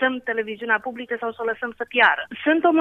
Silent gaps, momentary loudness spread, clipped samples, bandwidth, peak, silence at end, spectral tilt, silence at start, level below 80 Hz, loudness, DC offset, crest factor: none; 11 LU; under 0.1%; 5.2 kHz; -4 dBFS; 0 s; -5.5 dB/octave; 0 s; -66 dBFS; -22 LUFS; under 0.1%; 18 dB